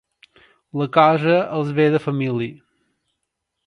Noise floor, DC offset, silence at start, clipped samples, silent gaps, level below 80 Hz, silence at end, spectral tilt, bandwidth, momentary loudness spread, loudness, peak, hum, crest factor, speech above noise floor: -78 dBFS; under 0.1%; 0.75 s; under 0.1%; none; -66 dBFS; 1.15 s; -8.5 dB/octave; 10 kHz; 12 LU; -18 LUFS; 0 dBFS; none; 20 dB; 60 dB